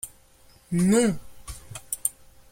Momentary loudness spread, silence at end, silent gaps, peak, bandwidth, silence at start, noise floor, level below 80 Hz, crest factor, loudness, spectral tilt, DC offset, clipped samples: 21 LU; 0.4 s; none; -4 dBFS; 16.5 kHz; 0.05 s; -55 dBFS; -50 dBFS; 22 dB; -25 LUFS; -5 dB/octave; under 0.1%; under 0.1%